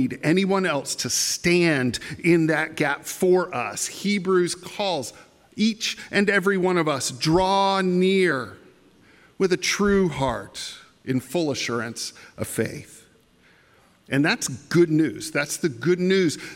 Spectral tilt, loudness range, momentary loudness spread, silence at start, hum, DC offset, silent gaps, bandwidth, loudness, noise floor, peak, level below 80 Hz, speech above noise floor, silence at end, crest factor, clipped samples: -4.5 dB/octave; 6 LU; 10 LU; 0 s; none; under 0.1%; none; 16.5 kHz; -22 LUFS; -57 dBFS; -6 dBFS; -52 dBFS; 35 dB; 0 s; 16 dB; under 0.1%